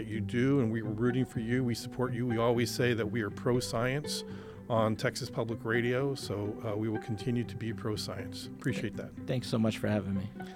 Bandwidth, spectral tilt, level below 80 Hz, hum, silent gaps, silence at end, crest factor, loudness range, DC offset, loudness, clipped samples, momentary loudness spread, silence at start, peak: 16.5 kHz; -6 dB/octave; -58 dBFS; none; none; 0 s; 18 dB; 4 LU; under 0.1%; -33 LUFS; under 0.1%; 8 LU; 0 s; -14 dBFS